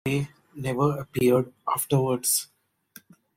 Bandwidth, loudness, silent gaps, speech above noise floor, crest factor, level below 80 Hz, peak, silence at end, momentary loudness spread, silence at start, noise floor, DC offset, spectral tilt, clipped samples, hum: 16.5 kHz; -25 LUFS; none; 29 dB; 16 dB; -60 dBFS; -10 dBFS; 0.9 s; 11 LU; 0.05 s; -54 dBFS; under 0.1%; -5 dB/octave; under 0.1%; none